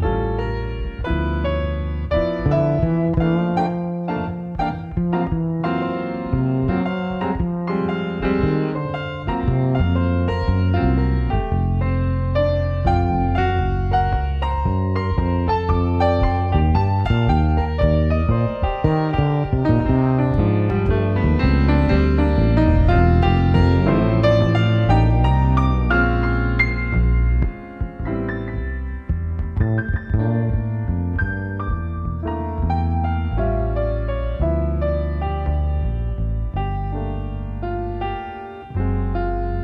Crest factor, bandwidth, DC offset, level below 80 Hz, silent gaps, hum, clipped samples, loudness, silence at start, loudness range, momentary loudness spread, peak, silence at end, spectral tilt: 16 dB; 5.8 kHz; under 0.1%; -24 dBFS; none; none; under 0.1%; -20 LUFS; 0 s; 7 LU; 9 LU; -2 dBFS; 0 s; -9.5 dB/octave